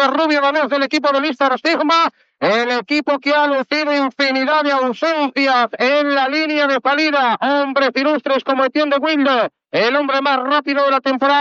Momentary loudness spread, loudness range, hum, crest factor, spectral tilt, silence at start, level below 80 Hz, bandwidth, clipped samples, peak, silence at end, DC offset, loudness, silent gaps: 3 LU; 1 LU; none; 14 dB; -3.5 dB/octave; 0 s; -78 dBFS; 7.8 kHz; under 0.1%; -2 dBFS; 0 s; under 0.1%; -16 LUFS; none